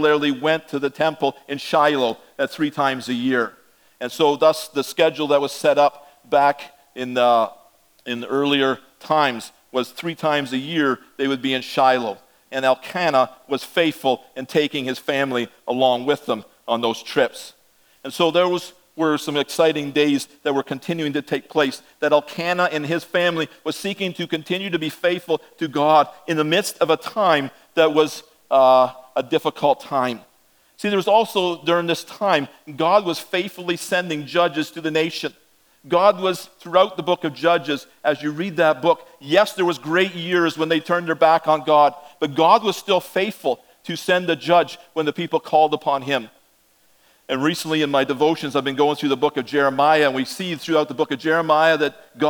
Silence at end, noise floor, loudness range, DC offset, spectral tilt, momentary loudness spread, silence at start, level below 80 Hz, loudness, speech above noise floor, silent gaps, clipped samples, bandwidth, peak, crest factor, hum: 0 s; -59 dBFS; 3 LU; under 0.1%; -4.5 dB/octave; 9 LU; 0 s; -72 dBFS; -20 LUFS; 39 dB; none; under 0.1%; over 20 kHz; 0 dBFS; 20 dB; none